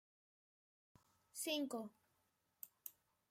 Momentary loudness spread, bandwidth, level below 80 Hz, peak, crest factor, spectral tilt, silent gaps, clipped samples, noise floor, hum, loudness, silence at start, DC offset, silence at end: 16 LU; 16 kHz; under -90 dBFS; -30 dBFS; 22 dB; -2 dB/octave; none; under 0.1%; -84 dBFS; none; -47 LUFS; 1.35 s; under 0.1%; 0.4 s